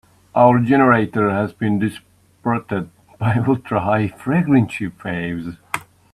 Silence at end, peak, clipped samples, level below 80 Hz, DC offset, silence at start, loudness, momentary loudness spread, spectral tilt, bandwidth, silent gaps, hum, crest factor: 0.3 s; 0 dBFS; under 0.1%; -52 dBFS; under 0.1%; 0.35 s; -19 LUFS; 13 LU; -8 dB/octave; 13.5 kHz; none; none; 18 dB